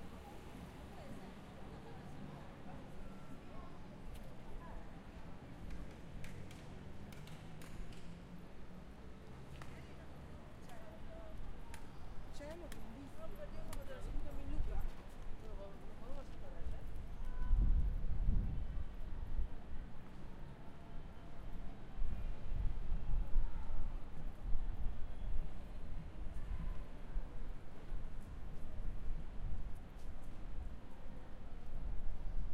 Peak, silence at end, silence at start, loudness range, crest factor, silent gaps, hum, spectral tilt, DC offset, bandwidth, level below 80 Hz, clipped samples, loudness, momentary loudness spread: -20 dBFS; 0 s; 0 s; 11 LU; 18 dB; none; none; -7 dB/octave; under 0.1%; 5 kHz; -42 dBFS; under 0.1%; -50 LUFS; 10 LU